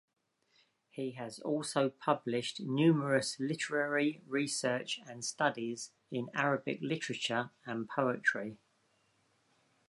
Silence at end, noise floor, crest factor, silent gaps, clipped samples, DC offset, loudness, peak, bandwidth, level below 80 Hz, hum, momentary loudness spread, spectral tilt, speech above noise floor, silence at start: 1.35 s; -74 dBFS; 20 dB; none; under 0.1%; under 0.1%; -34 LUFS; -14 dBFS; 11.5 kHz; -82 dBFS; none; 11 LU; -4.5 dB/octave; 40 dB; 0.95 s